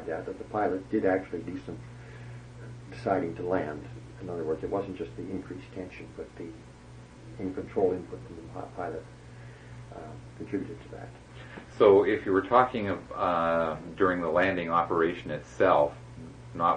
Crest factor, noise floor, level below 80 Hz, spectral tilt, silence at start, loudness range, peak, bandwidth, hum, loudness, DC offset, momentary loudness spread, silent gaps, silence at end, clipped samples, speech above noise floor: 24 dB; -49 dBFS; -56 dBFS; -7 dB/octave; 0 s; 12 LU; -6 dBFS; 9.8 kHz; none; -28 LUFS; under 0.1%; 22 LU; none; 0 s; under 0.1%; 20 dB